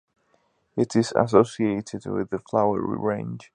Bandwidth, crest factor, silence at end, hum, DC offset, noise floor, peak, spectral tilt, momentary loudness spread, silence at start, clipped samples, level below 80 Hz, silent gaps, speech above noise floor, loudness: 10.5 kHz; 22 dB; 0.1 s; none; under 0.1%; -67 dBFS; -2 dBFS; -6.5 dB/octave; 11 LU; 0.75 s; under 0.1%; -58 dBFS; none; 44 dB; -24 LUFS